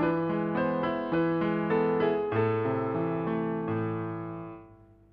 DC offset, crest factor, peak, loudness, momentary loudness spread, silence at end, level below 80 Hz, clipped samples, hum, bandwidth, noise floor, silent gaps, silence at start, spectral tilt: under 0.1%; 14 dB; -14 dBFS; -29 LUFS; 10 LU; 0.35 s; -60 dBFS; under 0.1%; 50 Hz at -60 dBFS; 5.2 kHz; -54 dBFS; none; 0 s; -10.5 dB/octave